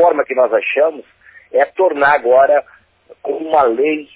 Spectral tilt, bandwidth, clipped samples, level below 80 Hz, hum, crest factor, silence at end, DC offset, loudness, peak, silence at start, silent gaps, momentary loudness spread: -7.5 dB/octave; 4 kHz; under 0.1%; -60 dBFS; none; 14 dB; 0.1 s; under 0.1%; -14 LUFS; -2 dBFS; 0 s; none; 9 LU